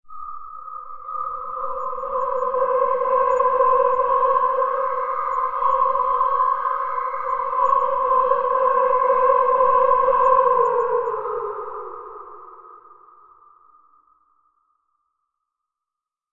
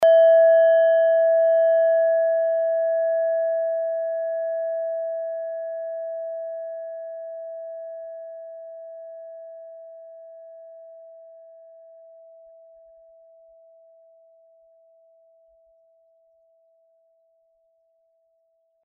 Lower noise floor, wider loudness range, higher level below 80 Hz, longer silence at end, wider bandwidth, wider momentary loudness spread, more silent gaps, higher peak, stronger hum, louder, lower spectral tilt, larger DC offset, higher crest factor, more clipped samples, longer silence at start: first, -87 dBFS vs -68 dBFS; second, 8 LU vs 25 LU; first, -56 dBFS vs -84 dBFS; second, 3.4 s vs 7.7 s; first, 7.2 kHz vs 3.3 kHz; second, 18 LU vs 26 LU; neither; first, -4 dBFS vs -10 dBFS; neither; about the same, -20 LUFS vs -21 LUFS; first, -5.5 dB/octave vs 1.5 dB/octave; neither; about the same, 18 dB vs 14 dB; neither; about the same, 0.05 s vs 0 s